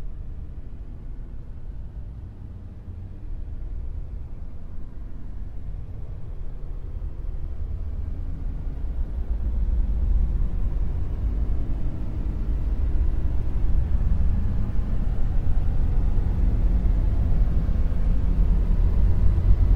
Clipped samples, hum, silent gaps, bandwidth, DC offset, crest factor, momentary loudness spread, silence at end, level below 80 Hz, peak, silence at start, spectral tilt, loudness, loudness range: under 0.1%; none; none; 3.3 kHz; under 0.1%; 16 dB; 16 LU; 0 s; -24 dBFS; -6 dBFS; 0 s; -10 dB/octave; -28 LUFS; 13 LU